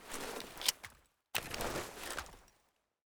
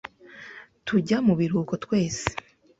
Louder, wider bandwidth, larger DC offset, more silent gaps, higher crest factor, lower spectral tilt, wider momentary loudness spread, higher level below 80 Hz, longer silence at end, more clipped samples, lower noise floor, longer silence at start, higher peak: second, -39 LUFS vs -25 LUFS; first, over 20 kHz vs 8 kHz; neither; neither; first, 34 dB vs 24 dB; second, -1.5 dB/octave vs -6 dB/octave; second, 15 LU vs 21 LU; second, -60 dBFS vs -54 dBFS; first, 0.65 s vs 0.4 s; neither; first, -77 dBFS vs -46 dBFS; second, 0 s vs 0.3 s; second, -10 dBFS vs -2 dBFS